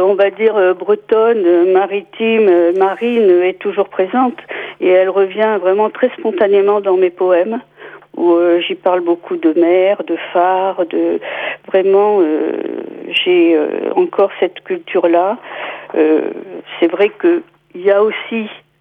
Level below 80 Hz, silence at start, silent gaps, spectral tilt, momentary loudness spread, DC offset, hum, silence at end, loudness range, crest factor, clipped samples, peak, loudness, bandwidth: -68 dBFS; 0 s; none; -7.5 dB/octave; 10 LU; under 0.1%; none; 0.25 s; 3 LU; 12 dB; under 0.1%; -2 dBFS; -14 LUFS; 3.8 kHz